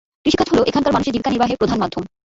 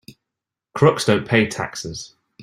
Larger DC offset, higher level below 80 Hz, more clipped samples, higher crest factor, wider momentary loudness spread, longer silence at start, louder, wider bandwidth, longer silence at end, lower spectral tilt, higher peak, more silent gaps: neither; first, -42 dBFS vs -56 dBFS; neither; about the same, 16 dB vs 20 dB; second, 6 LU vs 18 LU; first, 0.25 s vs 0.1 s; about the same, -18 LUFS vs -19 LUFS; second, 7.8 kHz vs 16 kHz; first, 0.3 s vs 0 s; about the same, -5.5 dB/octave vs -5 dB/octave; about the same, -4 dBFS vs -2 dBFS; neither